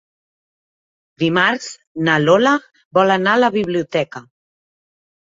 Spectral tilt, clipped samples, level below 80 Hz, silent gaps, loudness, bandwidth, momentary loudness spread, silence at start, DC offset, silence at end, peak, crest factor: -5 dB/octave; under 0.1%; -60 dBFS; 1.87-1.95 s, 2.85-2.91 s; -16 LUFS; 7.8 kHz; 12 LU; 1.2 s; under 0.1%; 1.1 s; -2 dBFS; 18 dB